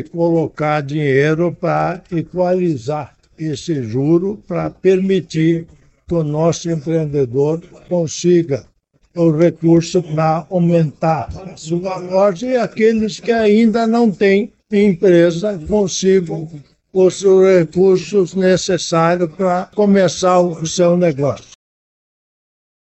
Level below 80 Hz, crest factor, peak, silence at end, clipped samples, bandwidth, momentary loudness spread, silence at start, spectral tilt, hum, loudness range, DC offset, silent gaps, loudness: -48 dBFS; 12 dB; -4 dBFS; 1.5 s; under 0.1%; 8.4 kHz; 10 LU; 0 s; -6.5 dB/octave; none; 4 LU; under 0.1%; none; -15 LUFS